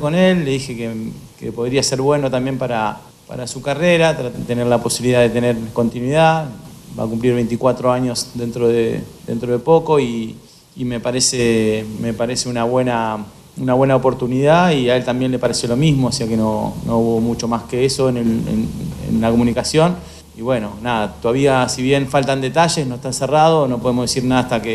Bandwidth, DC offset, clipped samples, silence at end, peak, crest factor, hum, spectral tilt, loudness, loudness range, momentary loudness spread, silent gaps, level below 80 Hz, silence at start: 14 kHz; under 0.1%; under 0.1%; 0 s; -2 dBFS; 16 dB; none; -5 dB/octave; -17 LUFS; 3 LU; 11 LU; none; -42 dBFS; 0 s